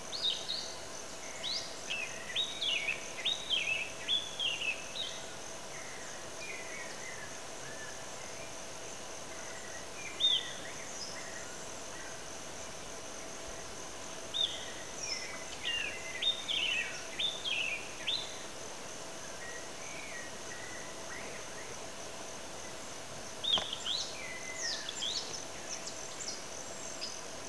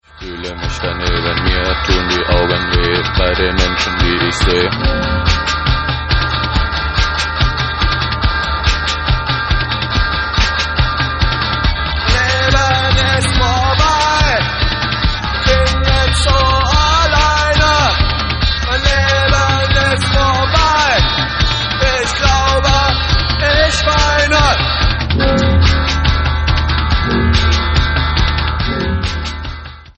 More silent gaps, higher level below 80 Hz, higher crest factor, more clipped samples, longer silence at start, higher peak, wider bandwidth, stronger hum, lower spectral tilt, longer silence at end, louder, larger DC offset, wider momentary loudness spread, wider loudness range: neither; second, -66 dBFS vs -18 dBFS; first, 22 dB vs 14 dB; neither; second, 0 s vs 0.15 s; second, -18 dBFS vs 0 dBFS; first, 11 kHz vs 8.8 kHz; neither; second, -0.5 dB/octave vs -4.5 dB/octave; about the same, 0 s vs 0.05 s; second, -37 LUFS vs -13 LUFS; first, 0.4% vs under 0.1%; first, 12 LU vs 5 LU; first, 9 LU vs 3 LU